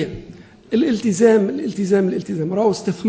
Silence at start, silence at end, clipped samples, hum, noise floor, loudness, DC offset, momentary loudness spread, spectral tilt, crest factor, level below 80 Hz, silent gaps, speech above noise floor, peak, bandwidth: 0 s; 0 s; under 0.1%; none; -41 dBFS; -18 LUFS; under 0.1%; 9 LU; -6.5 dB/octave; 16 dB; -52 dBFS; none; 23 dB; -2 dBFS; 8 kHz